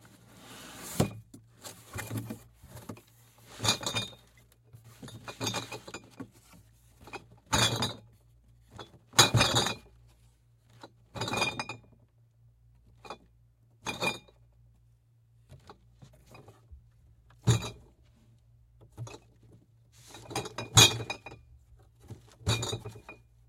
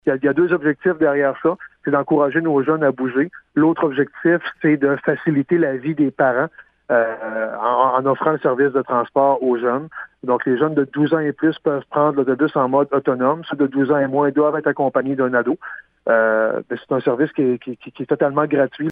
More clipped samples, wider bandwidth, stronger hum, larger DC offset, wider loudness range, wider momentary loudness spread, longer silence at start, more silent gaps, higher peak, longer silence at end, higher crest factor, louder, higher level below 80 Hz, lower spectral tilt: neither; first, 16.5 kHz vs 4.7 kHz; neither; neither; first, 13 LU vs 1 LU; first, 27 LU vs 6 LU; first, 0.45 s vs 0.05 s; neither; about the same, -4 dBFS vs -2 dBFS; first, 0.35 s vs 0 s; first, 32 dB vs 16 dB; second, -29 LUFS vs -18 LUFS; first, -56 dBFS vs -64 dBFS; second, -2.5 dB/octave vs -10 dB/octave